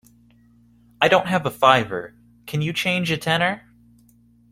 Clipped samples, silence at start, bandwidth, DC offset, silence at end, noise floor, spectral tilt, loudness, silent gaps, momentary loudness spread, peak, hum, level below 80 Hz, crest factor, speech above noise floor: under 0.1%; 1 s; 16 kHz; under 0.1%; 0.95 s; -55 dBFS; -5 dB/octave; -20 LUFS; none; 14 LU; 0 dBFS; none; -58 dBFS; 22 dB; 35 dB